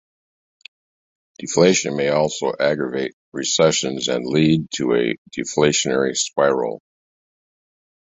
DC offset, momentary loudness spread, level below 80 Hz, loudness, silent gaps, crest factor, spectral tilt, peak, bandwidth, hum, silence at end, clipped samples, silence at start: under 0.1%; 10 LU; -58 dBFS; -19 LUFS; 3.13-3.32 s, 5.18-5.25 s; 20 dB; -4 dB/octave; -2 dBFS; 8.4 kHz; none; 1.4 s; under 0.1%; 1.4 s